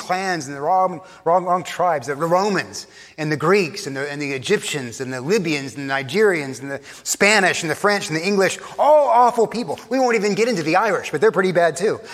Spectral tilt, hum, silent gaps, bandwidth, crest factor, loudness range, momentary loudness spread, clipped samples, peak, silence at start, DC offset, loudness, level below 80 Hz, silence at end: -4 dB/octave; none; none; 15.5 kHz; 18 dB; 5 LU; 11 LU; under 0.1%; 0 dBFS; 0 s; under 0.1%; -19 LUFS; -66 dBFS; 0 s